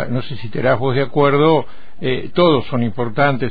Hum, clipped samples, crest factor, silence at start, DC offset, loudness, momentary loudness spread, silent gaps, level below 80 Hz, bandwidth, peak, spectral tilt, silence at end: none; under 0.1%; 14 dB; 0 s; 7%; -17 LUFS; 10 LU; none; -46 dBFS; 5 kHz; -2 dBFS; -10 dB/octave; 0 s